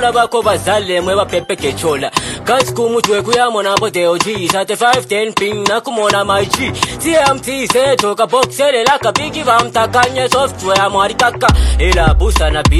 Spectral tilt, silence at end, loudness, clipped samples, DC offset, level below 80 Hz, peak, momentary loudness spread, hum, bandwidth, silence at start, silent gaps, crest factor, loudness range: -4 dB/octave; 0 s; -13 LUFS; under 0.1%; under 0.1%; -22 dBFS; 0 dBFS; 4 LU; none; 15 kHz; 0 s; none; 12 dB; 2 LU